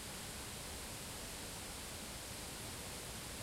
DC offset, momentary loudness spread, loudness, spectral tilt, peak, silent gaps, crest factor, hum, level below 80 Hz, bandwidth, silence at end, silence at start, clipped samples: under 0.1%; 0 LU; -46 LUFS; -2.5 dB/octave; -34 dBFS; none; 14 dB; none; -58 dBFS; 16 kHz; 0 s; 0 s; under 0.1%